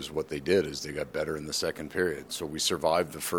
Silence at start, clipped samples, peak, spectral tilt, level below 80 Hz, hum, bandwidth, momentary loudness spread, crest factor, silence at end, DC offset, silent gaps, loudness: 0 s; under 0.1%; -12 dBFS; -3.5 dB/octave; -56 dBFS; none; 19.5 kHz; 7 LU; 18 dB; 0 s; under 0.1%; none; -30 LUFS